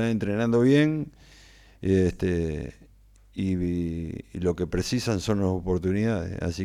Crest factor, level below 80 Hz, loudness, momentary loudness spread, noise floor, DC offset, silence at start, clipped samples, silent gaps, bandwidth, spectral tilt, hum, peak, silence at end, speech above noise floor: 16 dB; -46 dBFS; -26 LUFS; 12 LU; -55 dBFS; under 0.1%; 0 s; under 0.1%; none; 14.5 kHz; -7 dB/octave; none; -10 dBFS; 0 s; 30 dB